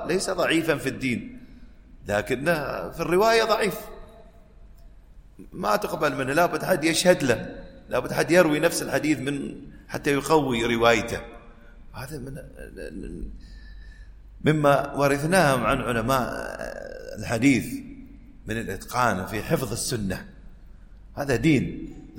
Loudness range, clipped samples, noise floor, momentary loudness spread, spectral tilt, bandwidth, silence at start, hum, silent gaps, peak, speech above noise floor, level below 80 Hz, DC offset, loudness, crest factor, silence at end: 6 LU; under 0.1%; -48 dBFS; 19 LU; -5 dB/octave; 16.5 kHz; 0 s; none; none; -2 dBFS; 24 dB; -44 dBFS; under 0.1%; -24 LUFS; 22 dB; 0 s